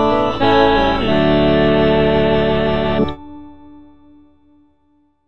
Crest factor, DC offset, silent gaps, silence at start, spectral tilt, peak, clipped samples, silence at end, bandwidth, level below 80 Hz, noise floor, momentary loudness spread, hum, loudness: 16 dB; under 0.1%; none; 0 s; -7.5 dB/octave; 0 dBFS; under 0.1%; 0 s; 7.4 kHz; -32 dBFS; -59 dBFS; 5 LU; none; -14 LUFS